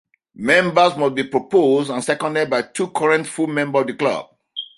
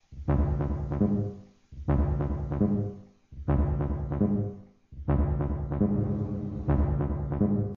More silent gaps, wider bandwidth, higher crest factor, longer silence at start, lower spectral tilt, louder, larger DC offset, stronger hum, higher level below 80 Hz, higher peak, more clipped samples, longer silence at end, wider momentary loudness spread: neither; first, 11.5 kHz vs 3.2 kHz; about the same, 18 dB vs 14 dB; first, 0.4 s vs 0.1 s; second, -4.5 dB/octave vs -11.5 dB/octave; first, -18 LUFS vs -29 LUFS; neither; neither; second, -62 dBFS vs -34 dBFS; first, 0 dBFS vs -14 dBFS; neither; about the same, 0.1 s vs 0 s; about the same, 8 LU vs 10 LU